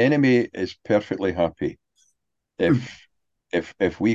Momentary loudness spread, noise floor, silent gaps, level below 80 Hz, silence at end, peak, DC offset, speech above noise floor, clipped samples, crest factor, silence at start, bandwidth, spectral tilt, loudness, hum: 12 LU; -74 dBFS; none; -50 dBFS; 0 s; -6 dBFS; under 0.1%; 52 dB; under 0.1%; 18 dB; 0 s; 7.6 kHz; -7.5 dB/octave; -23 LUFS; none